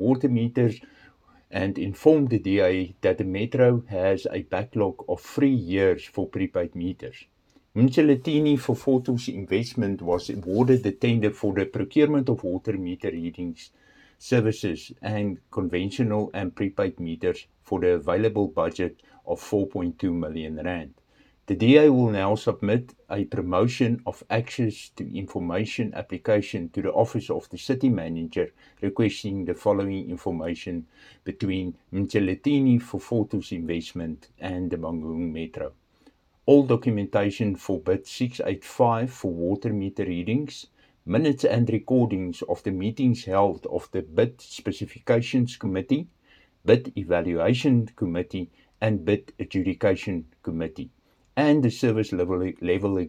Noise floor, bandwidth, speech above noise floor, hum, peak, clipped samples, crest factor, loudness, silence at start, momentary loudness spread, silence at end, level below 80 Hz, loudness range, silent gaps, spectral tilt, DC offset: -60 dBFS; 12.5 kHz; 36 dB; none; -4 dBFS; under 0.1%; 22 dB; -25 LUFS; 0 s; 12 LU; 0 s; -58 dBFS; 5 LU; none; -7.5 dB/octave; under 0.1%